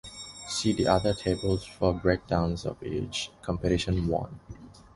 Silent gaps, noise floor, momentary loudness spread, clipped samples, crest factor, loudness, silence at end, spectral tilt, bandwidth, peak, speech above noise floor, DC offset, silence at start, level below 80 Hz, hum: none; -47 dBFS; 16 LU; under 0.1%; 22 dB; -28 LUFS; 0.15 s; -5.5 dB/octave; 11.5 kHz; -8 dBFS; 19 dB; under 0.1%; 0.05 s; -42 dBFS; none